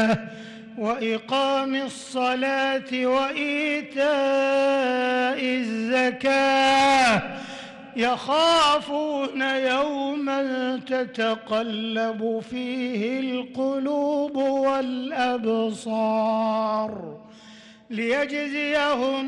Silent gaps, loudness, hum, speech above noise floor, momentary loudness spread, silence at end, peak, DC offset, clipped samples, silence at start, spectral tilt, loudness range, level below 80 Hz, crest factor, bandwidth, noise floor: none; -23 LUFS; none; 24 dB; 9 LU; 0 s; -12 dBFS; under 0.1%; under 0.1%; 0 s; -4 dB/octave; 5 LU; -62 dBFS; 12 dB; 12 kHz; -48 dBFS